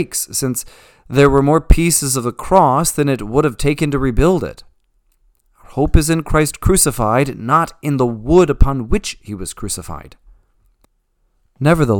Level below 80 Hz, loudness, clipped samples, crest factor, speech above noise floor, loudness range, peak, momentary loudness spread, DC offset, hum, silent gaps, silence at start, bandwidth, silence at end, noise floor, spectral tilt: -24 dBFS; -15 LUFS; 0.2%; 16 dB; 48 dB; 5 LU; 0 dBFS; 13 LU; under 0.1%; none; none; 0 s; 19 kHz; 0 s; -63 dBFS; -5 dB/octave